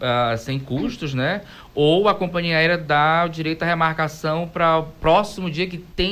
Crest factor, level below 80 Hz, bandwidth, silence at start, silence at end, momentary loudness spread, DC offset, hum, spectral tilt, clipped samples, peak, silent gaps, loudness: 14 dB; -42 dBFS; 15.5 kHz; 0 s; 0 s; 9 LU; under 0.1%; none; -6 dB/octave; under 0.1%; -6 dBFS; none; -20 LUFS